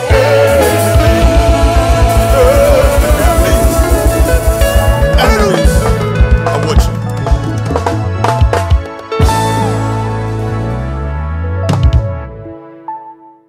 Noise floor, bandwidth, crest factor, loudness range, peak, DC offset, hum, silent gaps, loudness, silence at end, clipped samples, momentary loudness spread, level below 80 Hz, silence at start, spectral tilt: -34 dBFS; 16.5 kHz; 10 dB; 6 LU; 0 dBFS; under 0.1%; none; none; -11 LUFS; 0.35 s; under 0.1%; 10 LU; -14 dBFS; 0 s; -5.5 dB/octave